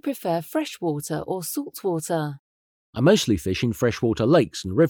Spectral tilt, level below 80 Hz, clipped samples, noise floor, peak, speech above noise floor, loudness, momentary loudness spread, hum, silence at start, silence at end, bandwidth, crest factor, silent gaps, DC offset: -5.5 dB/octave; -54 dBFS; under 0.1%; under -90 dBFS; -4 dBFS; over 67 dB; -24 LUFS; 10 LU; none; 0.05 s; 0 s; over 20 kHz; 20 dB; 2.39-2.93 s; under 0.1%